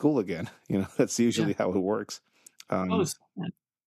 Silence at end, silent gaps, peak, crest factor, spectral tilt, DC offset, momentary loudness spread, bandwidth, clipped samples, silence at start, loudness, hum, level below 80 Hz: 0.35 s; none; -10 dBFS; 18 dB; -5.5 dB/octave; under 0.1%; 13 LU; 14.5 kHz; under 0.1%; 0 s; -29 LUFS; none; -68 dBFS